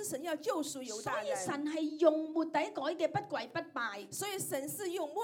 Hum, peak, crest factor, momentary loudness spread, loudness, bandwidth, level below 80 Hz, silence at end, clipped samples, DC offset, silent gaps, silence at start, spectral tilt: none; -14 dBFS; 22 dB; 9 LU; -36 LUFS; 18 kHz; -82 dBFS; 0 s; under 0.1%; under 0.1%; none; 0 s; -3.5 dB/octave